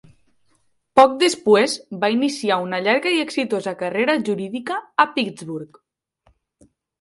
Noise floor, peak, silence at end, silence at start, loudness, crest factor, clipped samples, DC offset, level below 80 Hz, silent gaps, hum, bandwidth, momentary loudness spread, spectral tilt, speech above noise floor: -63 dBFS; 0 dBFS; 1.35 s; 0.95 s; -19 LUFS; 20 dB; under 0.1%; under 0.1%; -66 dBFS; none; none; 11.5 kHz; 11 LU; -4 dB/octave; 44 dB